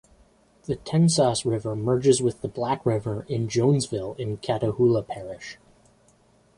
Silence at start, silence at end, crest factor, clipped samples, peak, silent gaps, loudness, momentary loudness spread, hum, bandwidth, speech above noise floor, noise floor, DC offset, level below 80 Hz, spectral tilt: 0.7 s; 1.05 s; 18 dB; under 0.1%; -6 dBFS; none; -24 LUFS; 14 LU; none; 11.5 kHz; 36 dB; -60 dBFS; under 0.1%; -54 dBFS; -6 dB/octave